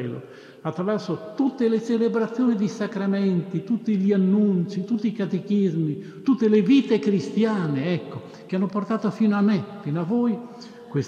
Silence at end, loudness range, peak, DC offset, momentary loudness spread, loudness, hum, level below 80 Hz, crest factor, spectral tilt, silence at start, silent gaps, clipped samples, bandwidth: 0 s; 3 LU; -8 dBFS; under 0.1%; 11 LU; -23 LUFS; none; -74 dBFS; 14 dB; -8 dB/octave; 0 s; none; under 0.1%; 7.4 kHz